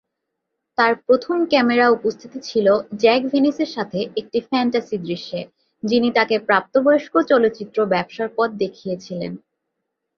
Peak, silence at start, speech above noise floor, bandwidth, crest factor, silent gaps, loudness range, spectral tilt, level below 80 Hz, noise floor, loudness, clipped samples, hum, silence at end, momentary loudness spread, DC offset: -2 dBFS; 0.8 s; 60 dB; 7 kHz; 18 dB; none; 3 LU; -6 dB/octave; -64 dBFS; -79 dBFS; -19 LUFS; under 0.1%; none; 0.8 s; 13 LU; under 0.1%